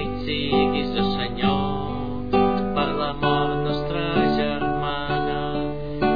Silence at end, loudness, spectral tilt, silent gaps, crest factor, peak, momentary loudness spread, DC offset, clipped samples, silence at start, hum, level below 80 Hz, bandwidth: 0 s; -23 LUFS; -8.5 dB/octave; none; 16 dB; -6 dBFS; 6 LU; 2%; under 0.1%; 0 s; none; -40 dBFS; 5 kHz